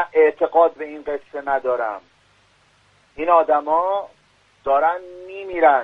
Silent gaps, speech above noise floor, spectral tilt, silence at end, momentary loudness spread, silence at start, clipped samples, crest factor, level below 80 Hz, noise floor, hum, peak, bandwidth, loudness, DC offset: none; 39 dB; -6 dB/octave; 0 s; 15 LU; 0 s; under 0.1%; 18 dB; -60 dBFS; -58 dBFS; none; -2 dBFS; 5.6 kHz; -20 LUFS; under 0.1%